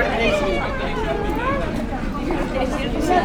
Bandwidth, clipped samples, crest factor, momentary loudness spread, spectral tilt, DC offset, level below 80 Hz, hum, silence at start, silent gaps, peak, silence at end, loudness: 17.5 kHz; under 0.1%; 16 dB; 6 LU; -5.5 dB/octave; under 0.1%; -28 dBFS; none; 0 s; none; -4 dBFS; 0 s; -22 LUFS